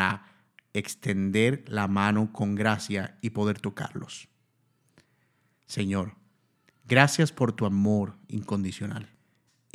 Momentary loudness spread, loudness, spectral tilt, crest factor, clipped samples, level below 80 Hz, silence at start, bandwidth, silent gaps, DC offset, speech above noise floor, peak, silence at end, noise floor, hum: 14 LU; -27 LUFS; -5.5 dB/octave; 28 dB; under 0.1%; -70 dBFS; 0 s; 14 kHz; none; under 0.1%; 44 dB; 0 dBFS; 0.7 s; -70 dBFS; none